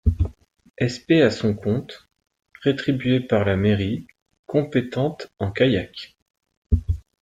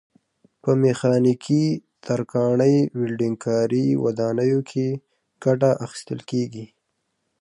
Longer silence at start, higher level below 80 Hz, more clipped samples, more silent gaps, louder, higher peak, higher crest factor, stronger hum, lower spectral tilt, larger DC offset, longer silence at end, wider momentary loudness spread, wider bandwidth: second, 0.05 s vs 0.65 s; first, -34 dBFS vs -66 dBFS; neither; first, 4.22-4.26 s, 4.39-4.44 s, 6.22-6.26 s, 6.57-6.62 s vs none; about the same, -22 LUFS vs -22 LUFS; about the same, -4 dBFS vs -6 dBFS; about the same, 18 dB vs 16 dB; neither; about the same, -7.5 dB/octave vs -7.5 dB/octave; neither; second, 0.2 s vs 0.75 s; about the same, 11 LU vs 11 LU; second, 9.2 kHz vs 11 kHz